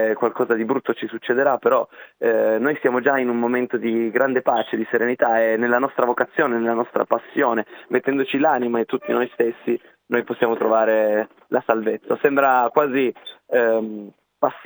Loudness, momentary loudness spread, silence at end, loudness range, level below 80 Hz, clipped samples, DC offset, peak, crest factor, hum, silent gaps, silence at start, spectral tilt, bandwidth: -20 LUFS; 7 LU; 0.05 s; 2 LU; -82 dBFS; under 0.1%; under 0.1%; -2 dBFS; 18 dB; none; none; 0 s; -8.5 dB/octave; over 20 kHz